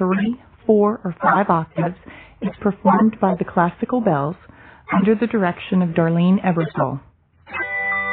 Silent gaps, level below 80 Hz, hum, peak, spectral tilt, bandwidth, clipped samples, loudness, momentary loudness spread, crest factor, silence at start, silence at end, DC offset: none; -52 dBFS; none; -2 dBFS; -12 dB/octave; 4.1 kHz; under 0.1%; -19 LUFS; 10 LU; 18 dB; 0 s; 0 s; under 0.1%